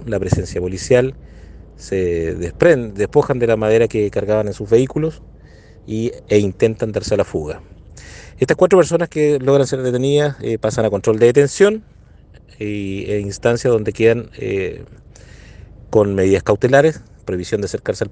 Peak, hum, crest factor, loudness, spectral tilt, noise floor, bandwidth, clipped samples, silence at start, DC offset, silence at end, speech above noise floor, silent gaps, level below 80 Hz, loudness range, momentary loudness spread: 0 dBFS; none; 18 dB; -17 LUFS; -6 dB/octave; -42 dBFS; 9.6 kHz; under 0.1%; 0 s; under 0.1%; 0 s; 26 dB; none; -42 dBFS; 4 LU; 12 LU